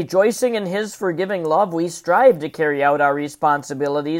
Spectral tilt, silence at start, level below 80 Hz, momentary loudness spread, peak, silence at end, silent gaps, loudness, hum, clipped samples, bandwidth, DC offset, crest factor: -5 dB/octave; 0 s; -68 dBFS; 8 LU; -2 dBFS; 0 s; none; -19 LUFS; none; under 0.1%; 16.5 kHz; under 0.1%; 18 dB